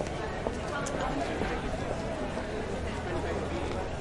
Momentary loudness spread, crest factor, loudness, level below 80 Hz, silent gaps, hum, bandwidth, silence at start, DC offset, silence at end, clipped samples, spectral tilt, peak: 3 LU; 20 dB; -34 LUFS; -42 dBFS; none; none; 11.5 kHz; 0 s; under 0.1%; 0 s; under 0.1%; -5.5 dB/octave; -14 dBFS